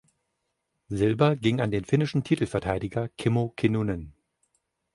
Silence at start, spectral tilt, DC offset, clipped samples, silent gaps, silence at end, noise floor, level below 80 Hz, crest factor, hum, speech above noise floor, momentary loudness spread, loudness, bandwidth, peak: 0.9 s; -7.5 dB/octave; under 0.1%; under 0.1%; none; 0.85 s; -79 dBFS; -50 dBFS; 20 dB; none; 54 dB; 8 LU; -26 LUFS; 11.5 kHz; -6 dBFS